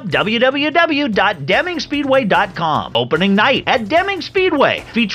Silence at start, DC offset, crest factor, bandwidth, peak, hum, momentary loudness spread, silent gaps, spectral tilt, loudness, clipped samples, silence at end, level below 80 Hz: 0 s; under 0.1%; 14 dB; 14 kHz; 0 dBFS; none; 4 LU; none; -5.5 dB/octave; -15 LUFS; under 0.1%; 0 s; -48 dBFS